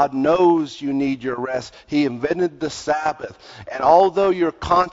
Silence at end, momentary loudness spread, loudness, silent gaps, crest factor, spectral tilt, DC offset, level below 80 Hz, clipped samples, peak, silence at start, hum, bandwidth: 0 s; 13 LU; -19 LUFS; none; 18 dB; -6 dB/octave; under 0.1%; -50 dBFS; under 0.1%; -2 dBFS; 0 s; none; 7.8 kHz